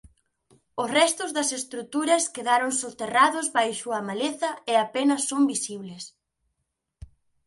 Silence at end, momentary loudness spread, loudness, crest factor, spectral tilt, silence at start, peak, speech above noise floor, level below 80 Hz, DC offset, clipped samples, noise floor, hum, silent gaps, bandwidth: 0.4 s; 12 LU; -24 LUFS; 20 dB; -2 dB/octave; 0.75 s; -6 dBFS; 55 dB; -62 dBFS; under 0.1%; under 0.1%; -80 dBFS; none; none; 12 kHz